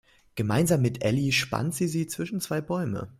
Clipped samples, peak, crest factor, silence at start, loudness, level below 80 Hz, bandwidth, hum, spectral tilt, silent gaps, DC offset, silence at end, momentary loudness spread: under 0.1%; -10 dBFS; 18 dB; 0.35 s; -27 LUFS; -56 dBFS; 16 kHz; none; -5 dB/octave; none; under 0.1%; 0.1 s; 8 LU